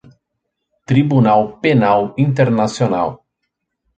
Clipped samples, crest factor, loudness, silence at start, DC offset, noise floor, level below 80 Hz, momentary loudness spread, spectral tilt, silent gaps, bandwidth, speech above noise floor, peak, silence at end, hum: under 0.1%; 14 dB; -15 LUFS; 0.9 s; under 0.1%; -75 dBFS; -52 dBFS; 5 LU; -7.5 dB/octave; none; 9 kHz; 61 dB; -2 dBFS; 0.8 s; none